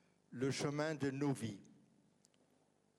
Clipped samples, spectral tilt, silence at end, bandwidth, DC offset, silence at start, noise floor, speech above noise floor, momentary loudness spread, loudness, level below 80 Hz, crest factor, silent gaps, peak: under 0.1%; -5.5 dB/octave; 1.3 s; 13 kHz; under 0.1%; 0.3 s; -76 dBFS; 36 dB; 13 LU; -41 LUFS; -80 dBFS; 18 dB; none; -26 dBFS